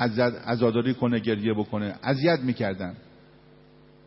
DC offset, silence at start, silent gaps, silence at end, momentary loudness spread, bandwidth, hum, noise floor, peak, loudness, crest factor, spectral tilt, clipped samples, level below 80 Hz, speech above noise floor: under 0.1%; 0 s; none; 1.05 s; 7 LU; 5.8 kHz; none; -54 dBFS; -8 dBFS; -26 LUFS; 18 dB; -11 dB/octave; under 0.1%; -62 dBFS; 29 dB